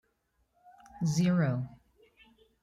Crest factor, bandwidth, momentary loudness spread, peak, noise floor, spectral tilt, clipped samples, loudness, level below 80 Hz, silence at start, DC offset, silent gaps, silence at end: 16 dB; 12.5 kHz; 11 LU; -18 dBFS; -76 dBFS; -6.5 dB/octave; under 0.1%; -30 LUFS; -66 dBFS; 0.95 s; under 0.1%; none; 0.95 s